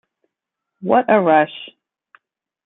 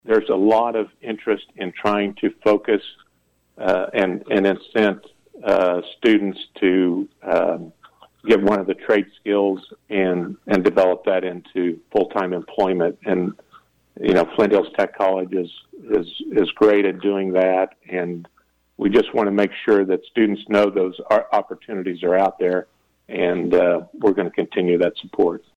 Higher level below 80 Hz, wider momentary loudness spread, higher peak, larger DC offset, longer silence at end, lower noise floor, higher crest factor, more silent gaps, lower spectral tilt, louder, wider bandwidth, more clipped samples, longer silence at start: second, -68 dBFS vs -58 dBFS; first, 21 LU vs 9 LU; first, -2 dBFS vs -6 dBFS; neither; first, 1 s vs 0.2 s; first, -82 dBFS vs -65 dBFS; about the same, 18 dB vs 14 dB; neither; first, -10 dB/octave vs -7 dB/octave; first, -16 LUFS vs -20 LUFS; second, 4 kHz vs 8.4 kHz; neither; first, 0.8 s vs 0.05 s